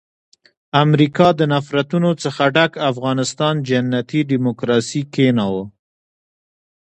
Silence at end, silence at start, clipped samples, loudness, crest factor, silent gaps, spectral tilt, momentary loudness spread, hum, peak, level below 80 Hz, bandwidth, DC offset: 1.15 s; 0.75 s; under 0.1%; -17 LUFS; 18 dB; none; -6 dB/octave; 6 LU; none; 0 dBFS; -56 dBFS; 9.4 kHz; under 0.1%